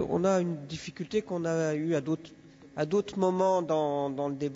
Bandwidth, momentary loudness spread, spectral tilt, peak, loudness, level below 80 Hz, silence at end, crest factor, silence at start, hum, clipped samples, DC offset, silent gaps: 8 kHz; 9 LU; -6.5 dB/octave; -14 dBFS; -30 LUFS; -64 dBFS; 0 s; 16 dB; 0 s; none; under 0.1%; under 0.1%; none